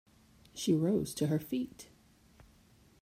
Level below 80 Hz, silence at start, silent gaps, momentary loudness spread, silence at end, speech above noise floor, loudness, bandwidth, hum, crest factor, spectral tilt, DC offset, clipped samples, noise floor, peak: -66 dBFS; 0.55 s; none; 22 LU; 1.2 s; 31 dB; -33 LUFS; 16 kHz; none; 18 dB; -6 dB/octave; under 0.1%; under 0.1%; -64 dBFS; -18 dBFS